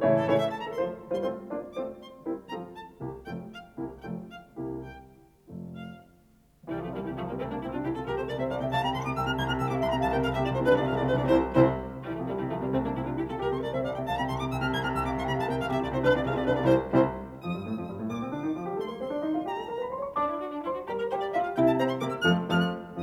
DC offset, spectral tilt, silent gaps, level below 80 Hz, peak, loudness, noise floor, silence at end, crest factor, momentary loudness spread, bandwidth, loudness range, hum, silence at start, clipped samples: under 0.1%; -7 dB/octave; none; -48 dBFS; -8 dBFS; -29 LUFS; -60 dBFS; 0 s; 20 dB; 15 LU; 15.5 kHz; 13 LU; none; 0 s; under 0.1%